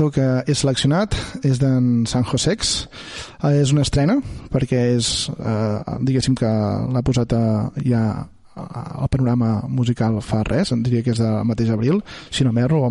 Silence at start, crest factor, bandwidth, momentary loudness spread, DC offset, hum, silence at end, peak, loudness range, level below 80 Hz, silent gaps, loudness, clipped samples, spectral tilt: 0 s; 12 dB; 11.5 kHz; 7 LU; under 0.1%; none; 0 s; -6 dBFS; 2 LU; -38 dBFS; none; -19 LUFS; under 0.1%; -6 dB/octave